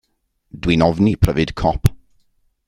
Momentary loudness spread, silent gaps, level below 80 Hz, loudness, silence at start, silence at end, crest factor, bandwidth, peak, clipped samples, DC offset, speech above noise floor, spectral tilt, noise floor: 5 LU; none; -30 dBFS; -18 LUFS; 0.55 s; 0.7 s; 18 dB; 16.5 kHz; 0 dBFS; under 0.1%; under 0.1%; 50 dB; -7 dB/octave; -66 dBFS